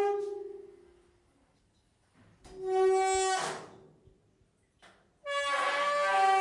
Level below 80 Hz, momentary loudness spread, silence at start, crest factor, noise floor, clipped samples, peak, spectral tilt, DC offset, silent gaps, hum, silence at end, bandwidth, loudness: -66 dBFS; 20 LU; 0 s; 16 dB; -70 dBFS; under 0.1%; -16 dBFS; -2 dB/octave; under 0.1%; none; none; 0 s; 11.5 kHz; -30 LUFS